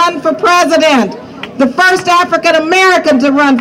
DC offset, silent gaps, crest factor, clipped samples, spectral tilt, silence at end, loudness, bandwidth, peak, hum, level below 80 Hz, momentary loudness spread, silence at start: under 0.1%; none; 10 dB; under 0.1%; -3 dB/octave; 0 s; -9 LUFS; 16.5 kHz; 0 dBFS; none; -52 dBFS; 7 LU; 0 s